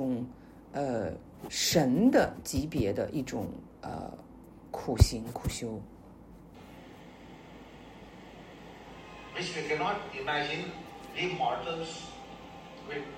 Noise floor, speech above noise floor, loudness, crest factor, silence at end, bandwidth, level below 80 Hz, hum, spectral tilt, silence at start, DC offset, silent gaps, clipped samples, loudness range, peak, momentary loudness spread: -52 dBFS; 21 dB; -32 LUFS; 26 dB; 0 s; 16 kHz; -46 dBFS; none; -5 dB/octave; 0 s; under 0.1%; none; under 0.1%; 15 LU; -6 dBFS; 24 LU